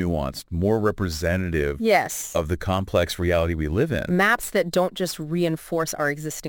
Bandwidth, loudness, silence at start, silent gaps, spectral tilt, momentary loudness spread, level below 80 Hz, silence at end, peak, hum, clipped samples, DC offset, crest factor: 17 kHz; -23 LUFS; 0 s; none; -5 dB/octave; 6 LU; -38 dBFS; 0 s; -4 dBFS; none; under 0.1%; under 0.1%; 18 dB